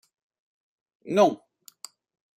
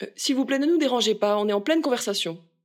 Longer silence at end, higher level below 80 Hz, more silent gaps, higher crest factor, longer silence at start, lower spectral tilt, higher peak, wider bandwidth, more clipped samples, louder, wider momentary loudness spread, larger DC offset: first, 1 s vs 0.3 s; about the same, -78 dBFS vs -82 dBFS; neither; first, 24 dB vs 14 dB; first, 1.05 s vs 0 s; first, -5 dB/octave vs -3.5 dB/octave; first, -6 dBFS vs -10 dBFS; about the same, 16 kHz vs 16.5 kHz; neither; about the same, -23 LUFS vs -23 LUFS; first, 23 LU vs 5 LU; neither